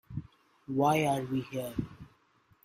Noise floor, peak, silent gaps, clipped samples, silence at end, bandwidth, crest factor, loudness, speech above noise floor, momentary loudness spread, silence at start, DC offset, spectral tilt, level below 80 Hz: -67 dBFS; -14 dBFS; none; under 0.1%; 0.6 s; 16 kHz; 18 dB; -31 LUFS; 37 dB; 17 LU; 0.1 s; under 0.1%; -6 dB/octave; -58 dBFS